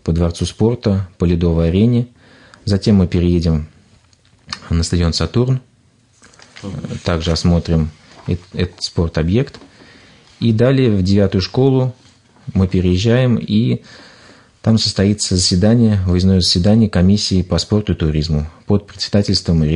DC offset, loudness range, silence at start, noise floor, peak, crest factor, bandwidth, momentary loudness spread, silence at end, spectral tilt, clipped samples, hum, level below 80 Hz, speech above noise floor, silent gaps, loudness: under 0.1%; 6 LU; 0.05 s; -53 dBFS; -2 dBFS; 12 dB; 10.5 kHz; 10 LU; 0 s; -6 dB/octave; under 0.1%; none; -36 dBFS; 39 dB; none; -16 LUFS